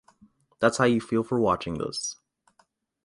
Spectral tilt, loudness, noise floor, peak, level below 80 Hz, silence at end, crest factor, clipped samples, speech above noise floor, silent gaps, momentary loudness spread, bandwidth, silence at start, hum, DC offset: -4.5 dB/octave; -26 LUFS; -67 dBFS; -6 dBFS; -56 dBFS; 0.95 s; 22 dB; under 0.1%; 42 dB; none; 10 LU; 11.5 kHz; 0.6 s; none; under 0.1%